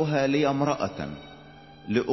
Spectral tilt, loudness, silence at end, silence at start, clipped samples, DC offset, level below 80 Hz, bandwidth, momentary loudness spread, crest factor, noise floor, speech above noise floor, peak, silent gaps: -6.5 dB/octave; -26 LUFS; 0 s; 0 s; under 0.1%; under 0.1%; -56 dBFS; 6.2 kHz; 22 LU; 16 dB; -48 dBFS; 23 dB; -10 dBFS; none